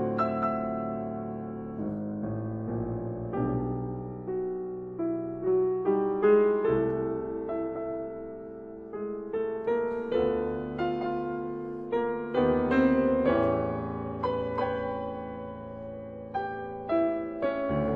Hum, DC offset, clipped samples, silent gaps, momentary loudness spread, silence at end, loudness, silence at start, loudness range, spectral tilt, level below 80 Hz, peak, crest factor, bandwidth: none; under 0.1%; under 0.1%; none; 12 LU; 0 s; -30 LUFS; 0 s; 6 LU; -10 dB/octave; -52 dBFS; -10 dBFS; 18 dB; 5.4 kHz